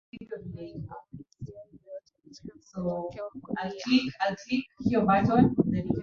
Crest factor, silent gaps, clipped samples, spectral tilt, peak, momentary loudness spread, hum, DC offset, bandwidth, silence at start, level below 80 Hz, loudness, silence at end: 20 dB; none; under 0.1%; -7 dB/octave; -8 dBFS; 23 LU; none; under 0.1%; 7 kHz; 0.15 s; -54 dBFS; -27 LUFS; 0 s